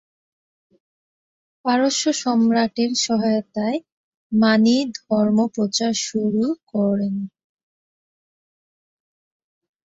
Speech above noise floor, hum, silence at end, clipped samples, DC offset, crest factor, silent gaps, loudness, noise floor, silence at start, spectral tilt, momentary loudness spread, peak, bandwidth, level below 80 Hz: over 71 dB; none; 2.7 s; under 0.1%; under 0.1%; 18 dB; 3.92-4.30 s, 6.63-6.67 s; -20 LUFS; under -90 dBFS; 1.65 s; -4.5 dB/octave; 8 LU; -4 dBFS; 8 kHz; -64 dBFS